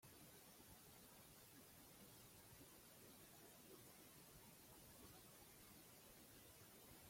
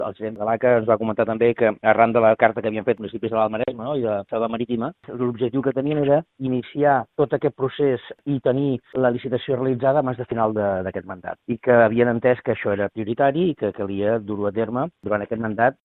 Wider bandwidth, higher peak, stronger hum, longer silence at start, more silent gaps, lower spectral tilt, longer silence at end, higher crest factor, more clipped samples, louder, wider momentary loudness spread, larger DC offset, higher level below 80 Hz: first, 16.5 kHz vs 4.1 kHz; second, -50 dBFS vs 0 dBFS; neither; about the same, 0 s vs 0 s; neither; second, -3 dB/octave vs -11 dB/octave; second, 0 s vs 0.15 s; about the same, 16 dB vs 20 dB; neither; second, -64 LUFS vs -21 LUFS; second, 1 LU vs 9 LU; neither; second, -80 dBFS vs -58 dBFS